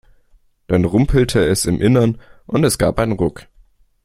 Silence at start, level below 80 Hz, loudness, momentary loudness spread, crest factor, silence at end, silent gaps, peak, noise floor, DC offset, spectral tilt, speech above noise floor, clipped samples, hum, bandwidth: 0.7 s; -32 dBFS; -16 LUFS; 7 LU; 16 dB; 0.65 s; none; -2 dBFS; -54 dBFS; under 0.1%; -6 dB/octave; 38 dB; under 0.1%; none; 16 kHz